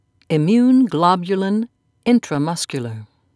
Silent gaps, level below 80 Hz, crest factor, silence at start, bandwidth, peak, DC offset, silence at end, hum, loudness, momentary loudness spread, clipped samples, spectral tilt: none; -64 dBFS; 18 dB; 0.3 s; 11 kHz; 0 dBFS; under 0.1%; 0.3 s; none; -18 LUFS; 14 LU; under 0.1%; -6 dB/octave